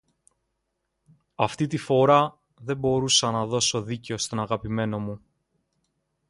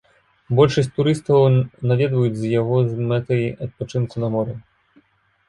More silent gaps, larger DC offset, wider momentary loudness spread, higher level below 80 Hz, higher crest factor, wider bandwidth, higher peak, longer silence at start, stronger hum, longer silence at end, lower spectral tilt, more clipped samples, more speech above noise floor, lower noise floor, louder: neither; neither; first, 13 LU vs 10 LU; about the same, -56 dBFS vs -52 dBFS; about the same, 22 dB vs 18 dB; about the same, 11.5 kHz vs 11 kHz; about the same, -4 dBFS vs -2 dBFS; first, 1.4 s vs 0.5 s; neither; first, 1.15 s vs 0.9 s; second, -4 dB/octave vs -8 dB/octave; neither; first, 54 dB vs 42 dB; first, -78 dBFS vs -60 dBFS; second, -24 LUFS vs -20 LUFS